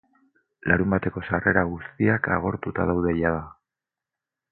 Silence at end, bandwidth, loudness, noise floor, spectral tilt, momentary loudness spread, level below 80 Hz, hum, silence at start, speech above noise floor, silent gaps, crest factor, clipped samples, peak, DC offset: 1 s; 4.3 kHz; -24 LUFS; -88 dBFS; -12 dB/octave; 8 LU; -44 dBFS; none; 0.65 s; 65 dB; none; 22 dB; under 0.1%; -4 dBFS; under 0.1%